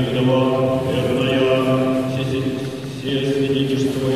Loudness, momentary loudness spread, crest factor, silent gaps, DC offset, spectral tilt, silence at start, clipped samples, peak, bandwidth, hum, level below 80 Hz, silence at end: -19 LUFS; 7 LU; 14 dB; none; 0.3%; -6.5 dB/octave; 0 s; under 0.1%; -6 dBFS; 14.5 kHz; none; -46 dBFS; 0 s